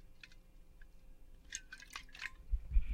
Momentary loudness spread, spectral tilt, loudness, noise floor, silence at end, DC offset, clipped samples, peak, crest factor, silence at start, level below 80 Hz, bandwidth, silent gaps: 24 LU; -2.5 dB/octave; -46 LUFS; -58 dBFS; 0 s; under 0.1%; under 0.1%; -20 dBFS; 22 dB; 0.05 s; -42 dBFS; 11 kHz; none